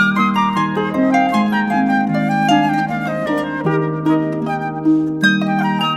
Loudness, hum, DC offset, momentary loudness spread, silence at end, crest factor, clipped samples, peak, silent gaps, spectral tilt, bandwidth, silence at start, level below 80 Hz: -16 LUFS; none; under 0.1%; 5 LU; 0 s; 14 dB; under 0.1%; -2 dBFS; none; -6.5 dB/octave; 13.5 kHz; 0 s; -52 dBFS